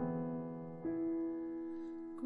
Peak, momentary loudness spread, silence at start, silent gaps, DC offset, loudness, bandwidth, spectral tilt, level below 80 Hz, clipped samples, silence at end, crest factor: -28 dBFS; 7 LU; 0 s; none; under 0.1%; -42 LUFS; 2.7 kHz; -11 dB/octave; -72 dBFS; under 0.1%; 0 s; 12 dB